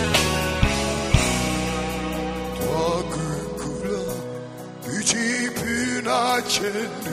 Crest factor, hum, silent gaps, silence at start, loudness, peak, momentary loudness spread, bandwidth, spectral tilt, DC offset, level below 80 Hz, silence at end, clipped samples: 22 dB; none; none; 0 s; -23 LUFS; -2 dBFS; 9 LU; 15.5 kHz; -3.5 dB/octave; under 0.1%; -34 dBFS; 0 s; under 0.1%